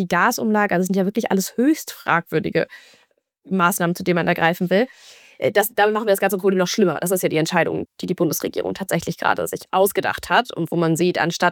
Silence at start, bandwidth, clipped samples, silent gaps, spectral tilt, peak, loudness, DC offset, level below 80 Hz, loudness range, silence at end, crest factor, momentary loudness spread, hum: 0 s; 19.5 kHz; under 0.1%; none; -5 dB/octave; -2 dBFS; -20 LUFS; under 0.1%; -60 dBFS; 2 LU; 0 s; 18 dB; 6 LU; none